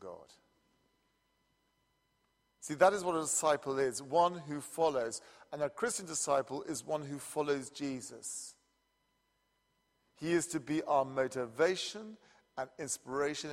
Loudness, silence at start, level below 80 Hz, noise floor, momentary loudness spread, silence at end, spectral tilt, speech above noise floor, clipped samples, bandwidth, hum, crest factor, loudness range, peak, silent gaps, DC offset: -35 LUFS; 0 s; -76 dBFS; -78 dBFS; 13 LU; 0 s; -3.5 dB/octave; 44 dB; under 0.1%; 16 kHz; none; 24 dB; 8 LU; -12 dBFS; none; under 0.1%